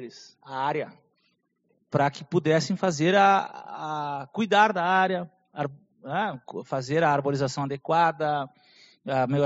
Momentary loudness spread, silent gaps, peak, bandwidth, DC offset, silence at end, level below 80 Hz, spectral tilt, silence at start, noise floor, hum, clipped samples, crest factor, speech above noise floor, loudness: 16 LU; none; -6 dBFS; 8 kHz; under 0.1%; 0 s; -68 dBFS; -4 dB/octave; 0 s; -72 dBFS; none; under 0.1%; 20 dB; 47 dB; -25 LUFS